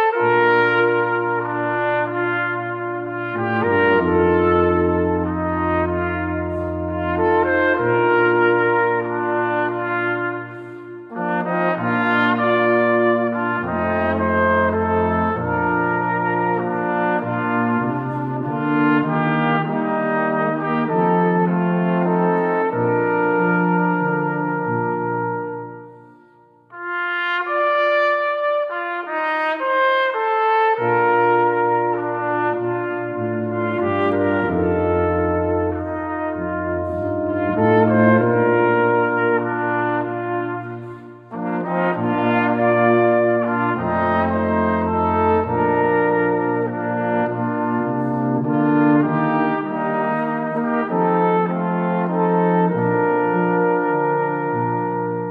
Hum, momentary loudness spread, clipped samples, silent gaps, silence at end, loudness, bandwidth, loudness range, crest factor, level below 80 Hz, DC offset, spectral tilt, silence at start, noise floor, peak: none; 8 LU; under 0.1%; none; 0 s; -19 LUFS; 5.2 kHz; 3 LU; 16 dB; -48 dBFS; under 0.1%; -9.5 dB/octave; 0 s; -51 dBFS; -4 dBFS